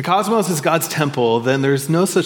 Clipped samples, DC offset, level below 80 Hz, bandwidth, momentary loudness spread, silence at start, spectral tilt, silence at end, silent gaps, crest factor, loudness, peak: under 0.1%; under 0.1%; -66 dBFS; 18 kHz; 1 LU; 0 s; -5 dB/octave; 0 s; none; 16 dB; -17 LUFS; -2 dBFS